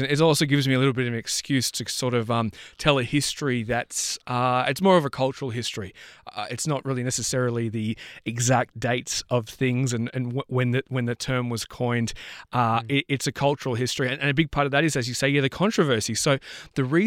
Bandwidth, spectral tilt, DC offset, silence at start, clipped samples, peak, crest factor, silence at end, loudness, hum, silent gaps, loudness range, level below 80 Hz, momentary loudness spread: 16.5 kHz; -4.5 dB/octave; under 0.1%; 0 s; under 0.1%; -4 dBFS; 20 dB; 0 s; -24 LUFS; none; none; 3 LU; -52 dBFS; 9 LU